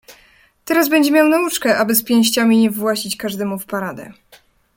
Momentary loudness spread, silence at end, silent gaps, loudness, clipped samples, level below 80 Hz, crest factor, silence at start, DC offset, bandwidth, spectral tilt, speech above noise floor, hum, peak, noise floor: 11 LU; 0.65 s; none; -16 LUFS; under 0.1%; -60 dBFS; 16 dB; 0.1 s; under 0.1%; 17 kHz; -3.5 dB/octave; 36 dB; none; 0 dBFS; -52 dBFS